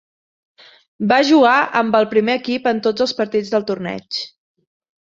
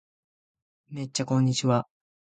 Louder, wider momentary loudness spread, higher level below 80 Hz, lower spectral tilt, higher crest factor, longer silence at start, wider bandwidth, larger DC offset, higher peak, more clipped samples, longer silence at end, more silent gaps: first, -17 LUFS vs -26 LUFS; second, 13 LU vs 18 LU; about the same, -62 dBFS vs -66 dBFS; about the same, -5 dB/octave vs -5.5 dB/octave; about the same, 16 dB vs 20 dB; about the same, 1 s vs 0.9 s; second, 7.6 kHz vs 9.4 kHz; neither; first, -2 dBFS vs -10 dBFS; neither; first, 0.75 s vs 0.5 s; neither